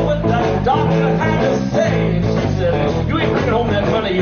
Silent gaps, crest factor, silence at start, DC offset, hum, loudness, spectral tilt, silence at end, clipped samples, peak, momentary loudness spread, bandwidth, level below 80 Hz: none; 12 dB; 0 s; under 0.1%; none; -16 LUFS; -6 dB/octave; 0 s; under 0.1%; -4 dBFS; 2 LU; 6.8 kHz; -32 dBFS